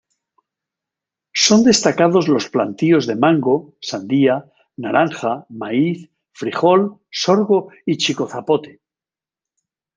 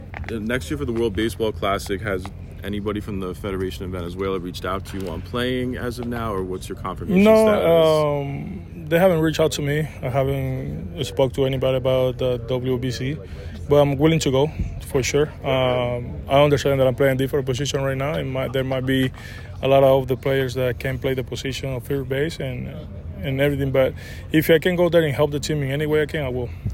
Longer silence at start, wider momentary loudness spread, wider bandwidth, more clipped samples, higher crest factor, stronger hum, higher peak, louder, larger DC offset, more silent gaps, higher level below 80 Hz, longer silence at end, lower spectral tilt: first, 1.35 s vs 0 s; about the same, 11 LU vs 13 LU; second, 9.4 kHz vs 16.5 kHz; neither; about the same, 18 dB vs 18 dB; neither; first, 0 dBFS vs -4 dBFS; first, -17 LUFS vs -21 LUFS; neither; neither; second, -62 dBFS vs -40 dBFS; first, 1.25 s vs 0 s; second, -4.5 dB/octave vs -6 dB/octave